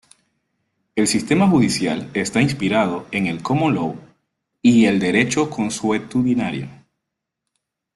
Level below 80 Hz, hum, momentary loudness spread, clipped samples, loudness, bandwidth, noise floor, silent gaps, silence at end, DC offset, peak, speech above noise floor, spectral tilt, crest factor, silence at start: -54 dBFS; none; 9 LU; under 0.1%; -19 LUFS; 12.5 kHz; -80 dBFS; none; 1.2 s; under 0.1%; -4 dBFS; 62 dB; -5 dB/octave; 16 dB; 0.95 s